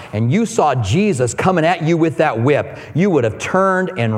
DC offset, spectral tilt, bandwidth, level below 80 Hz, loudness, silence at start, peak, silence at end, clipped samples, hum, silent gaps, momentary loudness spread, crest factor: under 0.1%; -6 dB/octave; 12.5 kHz; -52 dBFS; -16 LUFS; 0 s; 0 dBFS; 0 s; under 0.1%; none; none; 3 LU; 16 dB